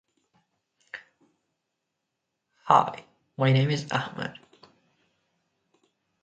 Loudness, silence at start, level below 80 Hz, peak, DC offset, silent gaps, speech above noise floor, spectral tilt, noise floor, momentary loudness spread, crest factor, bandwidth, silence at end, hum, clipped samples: -25 LUFS; 0.95 s; -70 dBFS; -4 dBFS; under 0.1%; none; 58 dB; -6.5 dB/octave; -82 dBFS; 23 LU; 26 dB; 8.6 kHz; 1.9 s; none; under 0.1%